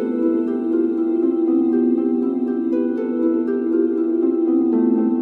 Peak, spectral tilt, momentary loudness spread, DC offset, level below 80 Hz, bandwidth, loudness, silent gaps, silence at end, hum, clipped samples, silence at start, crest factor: -8 dBFS; -10 dB/octave; 3 LU; under 0.1%; -80 dBFS; 2.8 kHz; -19 LUFS; none; 0 s; none; under 0.1%; 0 s; 10 dB